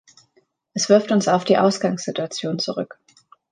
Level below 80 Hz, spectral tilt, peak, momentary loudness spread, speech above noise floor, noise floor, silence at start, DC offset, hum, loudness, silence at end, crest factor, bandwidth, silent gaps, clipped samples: -70 dBFS; -4.5 dB/octave; -2 dBFS; 12 LU; 44 dB; -63 dBFS; 0.75 s; under 0.1%; none; -20 LUFS; 0.65 s; 20 dB; 9.8 kHz; none; under 0.1%